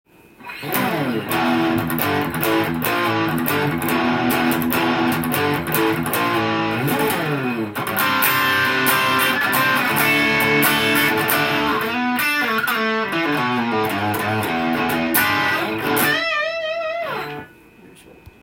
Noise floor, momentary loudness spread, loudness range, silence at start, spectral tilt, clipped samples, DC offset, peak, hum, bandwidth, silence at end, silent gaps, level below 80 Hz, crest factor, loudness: -46 dBFS; 7 LU; 4 LU; 0.4 s; -4 dB/octave; under 0.1%; under 0.1%; 0 dBFS; none; 17 kHz; 0.15 s; none; -52 dBFS; 20 dB; -18 LUFS